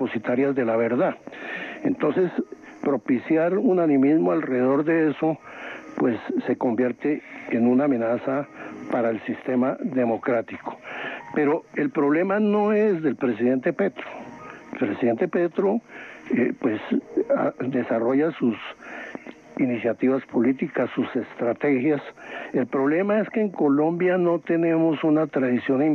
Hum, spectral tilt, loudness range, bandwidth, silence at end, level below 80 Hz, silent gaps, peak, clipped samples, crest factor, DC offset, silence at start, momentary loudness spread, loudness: none; -8.5 dB/octave; 4 LU; 6.6 kHz; 0 s; -70 dBFS; none; -12 dBFS; under 0.1%; 12 dB; under 0.1%; 0 s; 14 LU; -23 LUFS